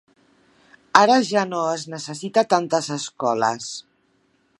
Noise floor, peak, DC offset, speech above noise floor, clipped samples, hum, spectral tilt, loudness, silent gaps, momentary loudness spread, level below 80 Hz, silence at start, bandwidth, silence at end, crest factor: -64 dBFS; 0 dBFS; under 0.1%; 43 dB; under 0.1%; none; -3.5 dB/octave; -20 LUFS; none; 15 LU; -72 dBFS; 0.95 s; 11.5 kHz; 0.8 s; 22 dB